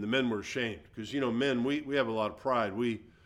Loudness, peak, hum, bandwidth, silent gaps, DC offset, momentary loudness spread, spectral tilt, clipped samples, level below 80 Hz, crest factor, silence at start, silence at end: -32 LUFS; -16 dBFS; none; 12 kHz; none; under 0.1%; 5 LU; -5.5 dB/octave; under 0.1%; -64 dBFS; 16 dB; 0 s; 0.15 s